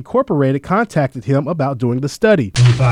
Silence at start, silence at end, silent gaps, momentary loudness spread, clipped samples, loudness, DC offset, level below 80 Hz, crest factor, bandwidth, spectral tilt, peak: 0 s; 0 s; none; 6 LU; under 0.1%; -16 LUFS; under 0.1%; -42 dBFS; 14 dB; 11.5 kHz; -7 dB/octave; 0 dBFS